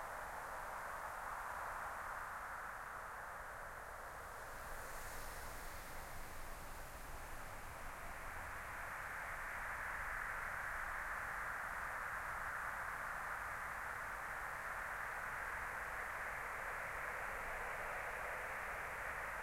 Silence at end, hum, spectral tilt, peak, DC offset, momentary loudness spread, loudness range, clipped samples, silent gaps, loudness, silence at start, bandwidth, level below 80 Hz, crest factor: 0 s; none; -3 dB/octave; -32 dBFS; under 0.1%; 7 LU; 7 LU; under 0.1%; none; -46 LUFS; 0 s; 16.5 kHz; -58 dBFS; 14 dB